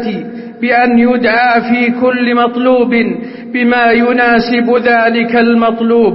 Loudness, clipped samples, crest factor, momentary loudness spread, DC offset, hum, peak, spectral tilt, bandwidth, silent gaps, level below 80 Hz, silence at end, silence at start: -10 LUFS; under 0.1%; 10 dB; 8 LU; under 0.1%; none; 0 dBFS; -9.5 dB/octave; 5.8 kHz; none; -48 dBFS; 0 s; 0 s